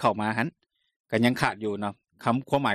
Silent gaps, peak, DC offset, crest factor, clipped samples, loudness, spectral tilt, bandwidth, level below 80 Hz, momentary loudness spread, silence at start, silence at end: 0.96-1.04 s; -8 dBFS; under 0.1%; 18 dB; under 0.1%; -27 LUFS; -6 dB/octave; 14 kHz; -62 dBFS; 9 LU; 0 s; 0 s